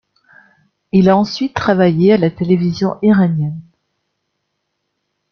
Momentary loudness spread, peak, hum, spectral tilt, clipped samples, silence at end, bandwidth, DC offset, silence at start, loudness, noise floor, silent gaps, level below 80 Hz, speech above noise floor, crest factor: 7 LU; -2 dBFS; 50 Hz at -35 dBFS; -8 dB/octave; under 0.1%; 1.7 s; 6.6 kHz; under 0.1%; 0.95 s; -14 LUFS; -72 dBFS; none; -50 dBFS; 59 dB; 14 dB